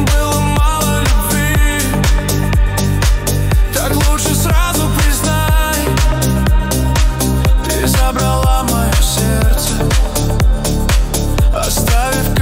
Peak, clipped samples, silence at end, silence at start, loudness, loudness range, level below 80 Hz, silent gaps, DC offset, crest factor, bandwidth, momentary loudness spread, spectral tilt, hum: 0 dBFS; under 0.1%; 0 s; 0 s; -14 LUFS; 1 LU; -14 dBFS; none; under 0.1%; 12 dB; 16.5 kHz; 2 LU; -4.5 dB/octave; none